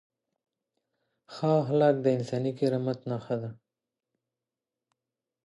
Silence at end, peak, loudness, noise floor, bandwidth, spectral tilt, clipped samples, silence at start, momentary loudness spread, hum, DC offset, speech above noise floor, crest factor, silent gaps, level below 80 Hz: 1.95 s; -10 dBFS; -28 LUFS; -90 dBFS; 11.5 kHz; -8 dB/octave; under 0.1%; 1.3 s; 11 LU; none; under 0.1%; 63 dB; 20 dB; none; -76 dBFS